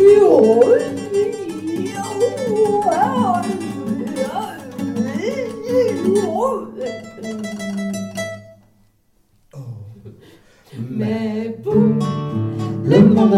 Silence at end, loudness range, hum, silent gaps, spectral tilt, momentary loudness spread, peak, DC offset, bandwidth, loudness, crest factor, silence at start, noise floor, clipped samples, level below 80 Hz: 0 s; 12 LU; none; none; -7 dB/octave; 17 LU; -2 dBFS; under 0.1%; 14.5 kHz; -18 LUFS; 16 dB; 0 s; -58 dBFS; under 0.1%; -56 dBFS